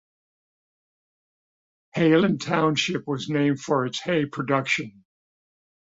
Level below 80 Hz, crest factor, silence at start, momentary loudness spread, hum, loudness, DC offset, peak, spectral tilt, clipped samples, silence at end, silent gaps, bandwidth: -66 dBFS; 20 dB; 1.95 s; 7 LU; none; -23 LUFS; under 0.1%; -6 dBFS; -5.5 dB/octave; under 0.1%; 1 s; none; 8 kHz